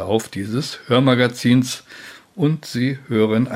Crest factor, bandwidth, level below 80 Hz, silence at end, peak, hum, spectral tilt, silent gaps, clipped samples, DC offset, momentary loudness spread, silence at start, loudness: 18 dB; 16 kHz; -62 dBFS; 0 s; -2 dBFS; none; -6 dB/octave; none; under 0.1%; under 0.1%; 14 LU; 0 s; -19 LUFS